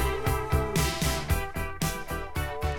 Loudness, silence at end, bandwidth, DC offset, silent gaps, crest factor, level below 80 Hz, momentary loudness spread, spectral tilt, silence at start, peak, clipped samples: -29 LUFS; 0 s; 18 kHz; 0.3%; none; 16 dB; -34 dBFS; 7 LU; -4.5 dB/octave; 0 s; -12 dBFS; under 0.1%